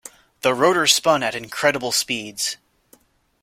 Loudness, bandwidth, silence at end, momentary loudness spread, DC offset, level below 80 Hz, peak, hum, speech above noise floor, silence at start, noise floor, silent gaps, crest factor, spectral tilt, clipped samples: -19 LUFS; 16.5 kHz; 0.9 s; 10 LU; under 0.1%; -62 dBFS; 0 dBFS; none; 37 dB; 0.05 s; -57 dBFS; none; 22 dB; -2 dB/octave; under 0.1%